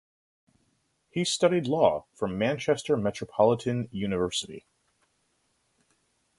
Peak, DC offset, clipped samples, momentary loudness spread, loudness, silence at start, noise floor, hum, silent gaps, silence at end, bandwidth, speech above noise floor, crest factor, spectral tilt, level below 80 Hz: -8 dBFS; under 0.1%; under 0.1%; 9 LU; -27 LUFS; 1.15 s; -73 dBFS; none; none; 1.8 s; 11.5 kHz; 46 dB; 22 dB; -5 dB/octave; -60 dBFS